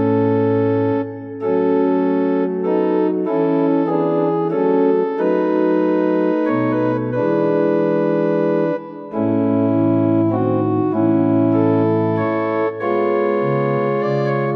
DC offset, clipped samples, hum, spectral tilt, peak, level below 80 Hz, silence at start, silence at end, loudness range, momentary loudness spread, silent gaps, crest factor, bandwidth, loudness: under 0.1%; under 0.1%; none; -10.5 dB/octave; -4 dBFS; -60 dBFS; 0 s; 0 s; 1 LU; 3 LU; none; 12 dB; 5.6 kHz; -17 LUFS